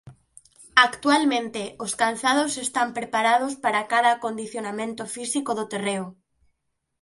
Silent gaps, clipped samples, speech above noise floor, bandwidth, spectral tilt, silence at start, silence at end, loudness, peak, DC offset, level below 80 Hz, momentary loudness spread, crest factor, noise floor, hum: none; under 0.1%; 52 dB; 11.5 kHz; -2.5 dB/octave; 0.05 s; 0.9 s; -23 LUFS; 0 dBFS; under 0.1%; -68 dBFS; 12 LU; 24 dB; -76 dBFS; none